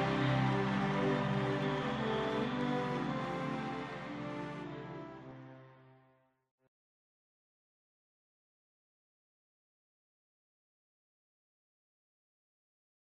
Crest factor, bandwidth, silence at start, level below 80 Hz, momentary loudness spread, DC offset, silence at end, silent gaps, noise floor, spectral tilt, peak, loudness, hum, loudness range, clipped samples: 18 dB; 9.6 kHz; 0 s; -64 dBFS; 15 LU; under 0.1%; 7.25 s; none; -71 dBFS; -7 dB/octave; -22 dBFS; -36 LUFS; none; 18 LU; under 0.1%